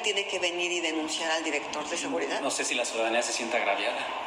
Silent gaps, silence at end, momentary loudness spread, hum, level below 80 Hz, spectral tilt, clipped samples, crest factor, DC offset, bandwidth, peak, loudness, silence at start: none; 0 s; 3 LU; none; -72 dBFS; -0.5 dB/octave; under 0.1%; 16 dB; under 0.1%; 15.5 kHz; -14 dBFS; -28 LUFS; 0 s